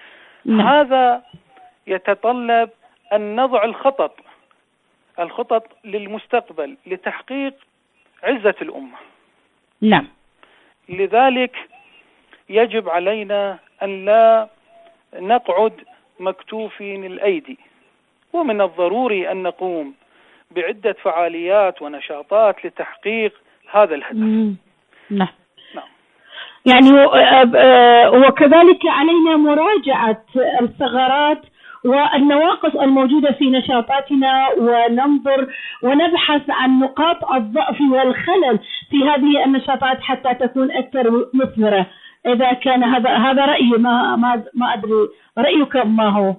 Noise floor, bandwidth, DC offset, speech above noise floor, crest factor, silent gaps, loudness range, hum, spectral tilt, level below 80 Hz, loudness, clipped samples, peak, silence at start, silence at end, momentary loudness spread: -63 dBFS; 4.1 kHz; under 0.1%; 48 dB; 16 dB; none; 12 LU; none; -7.5 dB/octave; -60 dBFS; -15 LUFS; under 0.1%; 0 dBFS; 0.45 s; 0.05 s; 17 LU